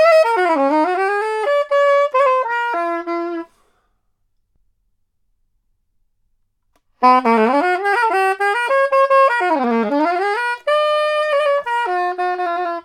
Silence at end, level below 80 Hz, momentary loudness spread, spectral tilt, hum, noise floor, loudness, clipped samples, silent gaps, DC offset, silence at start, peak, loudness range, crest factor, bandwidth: 0.05 s; -68 dBFS; 7 LU; -4 dB/octave; none; -65 dBFS; -16 LUFS; under 0.1%; none; under 0.1%; 0 s; 0 dBFS; 10 LU; 18 dB; 14.5 kHz